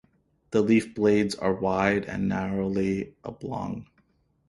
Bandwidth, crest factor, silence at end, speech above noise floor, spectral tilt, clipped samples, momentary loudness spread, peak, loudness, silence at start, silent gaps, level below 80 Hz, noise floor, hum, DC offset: 11.5 kHz; 20 dB; 0.65 s; 41 dB; -6.5 dB/octave; under 0.1%; 13 LU; -8 dBFS; -26 LUFS; 0.5 s; none; -54 dBFS; -67 dBFS; none; under 0.1%